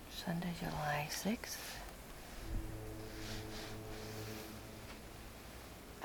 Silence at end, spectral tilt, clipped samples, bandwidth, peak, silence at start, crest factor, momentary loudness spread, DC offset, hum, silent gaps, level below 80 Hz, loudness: 0 s; -4.5 dB/octave; under 0.1%; over 20 kHz; -26 dBFS; 0 s; 18 dB; 13 LU; under 0.1%; none; none; -52 dBFS; -45 LUFS